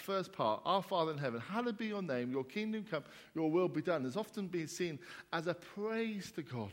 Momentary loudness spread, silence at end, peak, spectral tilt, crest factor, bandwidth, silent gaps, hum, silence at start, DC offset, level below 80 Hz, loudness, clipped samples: 9 LU; 0 s; -18 dBFS; -5.5 dB/octave; 20 dB; 16.5 kHz; none; none; 0 s; under 0.1%; -80 dBFS; -38 LUFS; under 0.1%